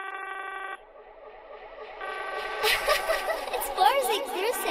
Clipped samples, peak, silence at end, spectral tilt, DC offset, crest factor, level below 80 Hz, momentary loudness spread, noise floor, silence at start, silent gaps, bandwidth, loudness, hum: under 0.1%; -8 dBFS; 0 s; -0.5 dB/octave; under 0.1%; 20 dB; -54 dBFS; 22 LU; -49 dBFS; 0 s; none; 16 kHz; -27 LUFS; none